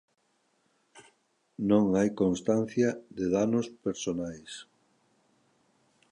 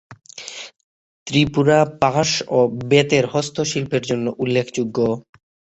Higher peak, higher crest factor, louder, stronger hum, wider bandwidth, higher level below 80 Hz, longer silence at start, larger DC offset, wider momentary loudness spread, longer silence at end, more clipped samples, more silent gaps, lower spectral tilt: second, -10 dBFS vs -2 dBFS; about the same, 20 dB vs 18 dB; second, -29 LUFS vs -19 LUFS; neither; first, 10.5 kHz vs 8.2 kHz; second, -62 dBFS vs -52 dBFS; first, 0.95 s vs 0.1 s; neither; about the same, 17 LU vs 18 LU; first, 1.5 s vs 0.5 s; neither; second, none vs 0.84-1.26 s; first, -6.5 dB/octave vs -5 dB/octave